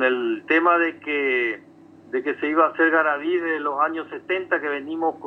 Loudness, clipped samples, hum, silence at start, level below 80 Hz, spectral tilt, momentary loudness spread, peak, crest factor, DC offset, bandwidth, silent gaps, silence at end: -22 LUFS; under 0.1%; none; 0 s; -76 dBFS; -6 dB/octave; 9 LU; -6 dBFS; 16 dB; under 0.1%; 5.8 kHz; none; 0 s